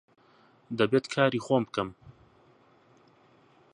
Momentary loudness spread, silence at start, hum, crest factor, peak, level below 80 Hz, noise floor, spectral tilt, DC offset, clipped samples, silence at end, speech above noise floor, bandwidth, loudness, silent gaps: 12 LU; 0.7 s; none; 24 dB; -8 dBFS; -68 dBFS; -61 dBFS; -6 dB/octave; under 0.1%; under 0.1%; 1.65 s; 34 dB; 11 kHz; -28 LUFS; none